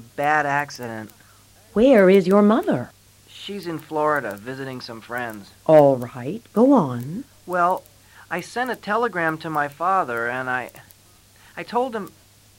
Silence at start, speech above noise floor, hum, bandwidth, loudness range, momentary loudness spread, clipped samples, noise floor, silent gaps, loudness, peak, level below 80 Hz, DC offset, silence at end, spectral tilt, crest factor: 0 s; 32 dB; none; 16.5 kHz; 5 LU; 19 LU; under 0.1%; -53 dBFS; none; -21 LUFS; -2 dBFS; -58 dBFS; under 0.1%; 0.5 s; -6.5 dB/octave; 18 dB